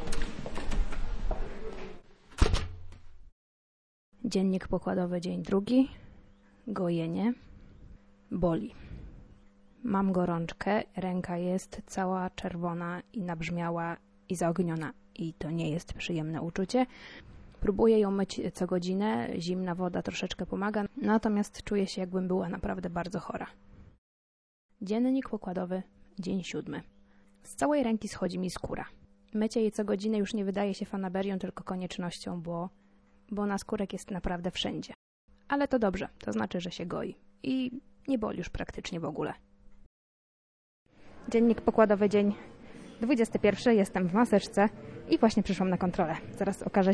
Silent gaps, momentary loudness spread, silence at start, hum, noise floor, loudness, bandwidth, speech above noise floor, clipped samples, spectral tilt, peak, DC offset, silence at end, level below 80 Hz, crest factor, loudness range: 3.32-4.12 s, 23.98-24.69 s, 34.95-35.28 s, 39.86-40.86 s; 14 LU; 0 s; none; -61 dBFS; -31 LUFS; 11 kHz; 31 dB; under 0.1%; -6.5 dB/octave; -8 dBFS; under 0.1%; 0 s; -44 dBFS; 24 dB; 8 LU